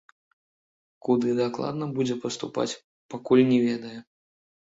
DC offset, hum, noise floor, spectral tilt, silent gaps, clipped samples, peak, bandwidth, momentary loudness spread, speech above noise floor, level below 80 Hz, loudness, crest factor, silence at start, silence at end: under 0.1%; none; under -90 dBFS; -6 dB/octave; 2.84-3.09 s; under 0.1%; -8 dBFS; 7.8 kHz; 19 LU; over 65 dB; -68 dBFS; -25 LUFS; 20 dB; 1.05 s; 0.7 s